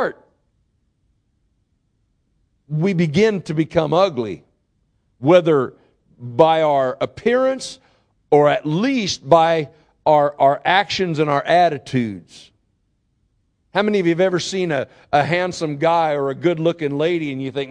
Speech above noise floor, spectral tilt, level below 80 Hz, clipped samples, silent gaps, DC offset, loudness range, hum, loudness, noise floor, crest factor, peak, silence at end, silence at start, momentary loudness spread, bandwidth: 49 dB; -6 dB/octave; -56 dBFS; under 0.1%; none; under 0.1%; 5 LU; none; -18 LUFS; -66 dBFS; 20 dB; 0 dBFS; 0 s; 0 s; 11 LU; 10.5 kHz